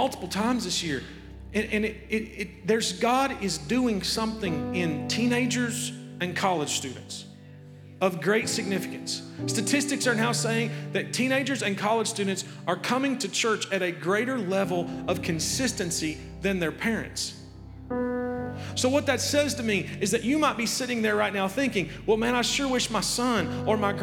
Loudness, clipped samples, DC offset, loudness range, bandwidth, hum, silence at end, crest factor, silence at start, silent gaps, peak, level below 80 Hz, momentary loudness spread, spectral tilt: -27 LUFS; under 0.1%; under 0.1%; 3 LU; 18 kHz; none; 0 s; 18 dB; 0 s; none; -8 dBFS; -52 dBFS; 8 LU; -3.5 dB/octave